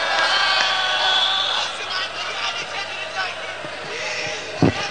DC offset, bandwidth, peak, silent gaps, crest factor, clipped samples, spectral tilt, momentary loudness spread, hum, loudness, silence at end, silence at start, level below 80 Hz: 0.5%; 10 kHz; -2 dBFS; none; 20 dB; under 0.1%; -3 dB/octave; 10 LU; none; -20 LUFS; 0 s; 0 s; -56 dBFS